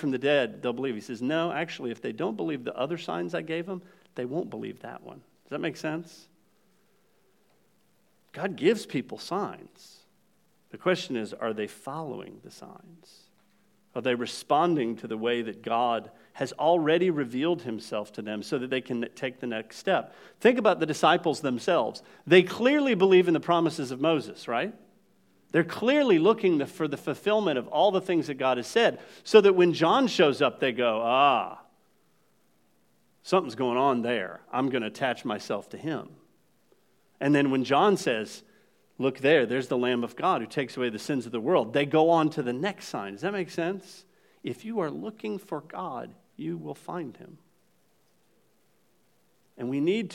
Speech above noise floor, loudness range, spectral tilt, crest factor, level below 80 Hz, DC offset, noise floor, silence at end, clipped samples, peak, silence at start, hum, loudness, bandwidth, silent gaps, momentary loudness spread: 42 dB; 13 LU; -5.5 dB/octave; 24 dB; -82 dBFS; under 0.1%; -68 dBFS; 0 s; under 0.1%; -4 dBFS; 0 s; none; -27 LUFS; 14.5 kHz; none; 15 LU